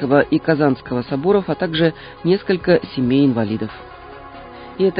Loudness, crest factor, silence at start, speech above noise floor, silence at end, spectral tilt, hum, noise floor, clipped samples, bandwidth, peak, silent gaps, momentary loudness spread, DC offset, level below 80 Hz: -18 LUFS; 16 dB; 0 s; 19 dB; 0 s; -12 dB/octave; none; -36 dBFS; under 0.1%; 5.2 kHz; -2 dBFS; none; 21 LU; under 0.1%; -48 dBFS